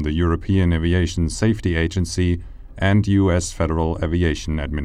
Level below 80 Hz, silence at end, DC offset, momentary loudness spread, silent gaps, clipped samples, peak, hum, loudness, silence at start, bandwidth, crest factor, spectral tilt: -30 dBFS; 0 s; under 0.1%; 5 LU; none; under 0.1%; -4 dBFS; none; -20 LUFS; 0 s; 10.5 kHz; 16 dB; -6.5 dB/octave